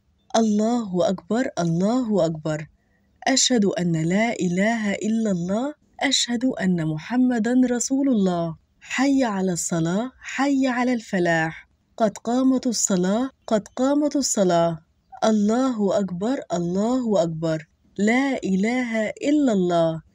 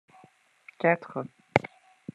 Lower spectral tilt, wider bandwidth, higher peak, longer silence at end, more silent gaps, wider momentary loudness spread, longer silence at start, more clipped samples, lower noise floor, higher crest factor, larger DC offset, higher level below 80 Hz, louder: second, -4.5 dB/octave vs -7 dB/octave; first, 16 kHz vs 10 kHz; second, -6 dBFS vs -2 dBFS; second, 0.15 s vs 0.5 s; neither; second, 7 LU vs 18 LU; second, 0.35 s vs 0.8 s; neither; about the same, -62 dBFS vs -60 dBFS; second, 16 dB vs 30 dB; neither; first, -60 dBFS vs -68 dBFS; first, -22 LUFS vs -29 LUFS